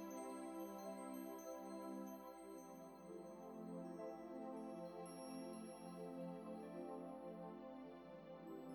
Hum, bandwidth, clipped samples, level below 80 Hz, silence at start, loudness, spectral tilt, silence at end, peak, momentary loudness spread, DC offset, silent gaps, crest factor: none; 19 kHz; under 0.1%; -82 dBFS; 0 s; -53 LUFS; -6 dB/octave; 0 s; -40 dBFS; 5 LU; under 0.1%; none; 12 dB